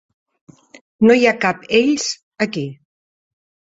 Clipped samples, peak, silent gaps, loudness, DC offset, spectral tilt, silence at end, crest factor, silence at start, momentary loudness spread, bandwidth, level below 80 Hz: under 0.1%; -2 dBFS; 2.23-2.31 s; -17 LUFS; under 0.1%; -4 dB/octave; 0.95 s; 18 dB; 1 s; 12 LU; 8 kHz; -60 dBFS